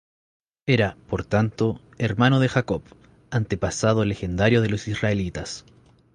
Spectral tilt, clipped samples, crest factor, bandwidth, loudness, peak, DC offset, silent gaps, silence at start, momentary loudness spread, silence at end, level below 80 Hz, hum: -6 dB/octave; under 0.1%; 18 dB; 10 kHz; -23 LUFS; -6 dBFS; under 0.1%; none; 0.65 s; 11 LU; 0.55 s; -44 dBFS; none